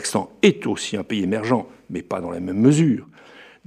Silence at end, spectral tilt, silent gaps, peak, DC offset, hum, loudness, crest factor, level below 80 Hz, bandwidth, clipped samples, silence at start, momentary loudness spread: 0.25 s; -5.5 dB/octave; none; -2 dBFS; under 0.1%; none; -21 LUFS; 18 dB; -62 dBFS; 14.5 kHz; under 0.1%; 0 s; 11 LU